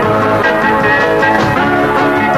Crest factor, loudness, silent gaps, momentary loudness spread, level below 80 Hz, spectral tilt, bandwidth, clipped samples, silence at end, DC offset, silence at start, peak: 10 dB; -11 LUFS; none; 1 LU; -36 dBFS; -6 dB/octave; 15 kHz; under 0.1%; 0 s; under 0.1%; 0 s; 0 dBFS